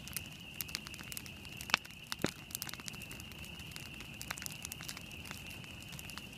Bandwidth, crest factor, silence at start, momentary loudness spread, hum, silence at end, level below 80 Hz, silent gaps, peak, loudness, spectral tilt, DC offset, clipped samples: 17.5 kHz; 38 dB; 0 s; 12 LU; none; 0 s; -60 dBFS; none; -6 dBFS; -42 LUFS; -2.5 dB/octave; under 0.1%; under 0.1%